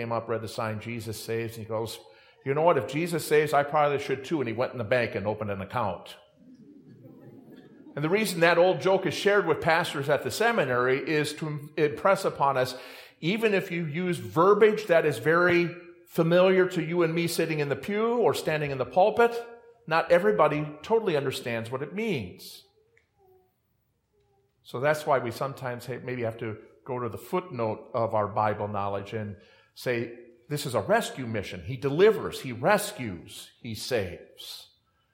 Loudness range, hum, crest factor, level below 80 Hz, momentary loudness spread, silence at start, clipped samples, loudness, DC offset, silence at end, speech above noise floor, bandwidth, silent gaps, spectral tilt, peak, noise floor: 8 LU; none; 20 dB; -68 dBFS; 15 LU; 0 s; under 0.1%; -27 LUFS; under 0.1%; 0.5 s; 47 dB; 16.5 kHz; none; -5.5 dB/octave; -6 dBFS; -73 dBFS